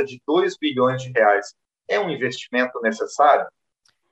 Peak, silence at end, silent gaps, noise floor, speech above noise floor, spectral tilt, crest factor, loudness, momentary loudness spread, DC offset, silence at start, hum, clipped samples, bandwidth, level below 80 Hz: -2 dBFS; 0.6 s; none; -67 dBFS; 46 dB; -5 dB/octave; 18 dB; -20 LUFS; 8 LU; under 0.1%; 0 s; none; under 0.1%; 8.4 kHz; -72 dBFS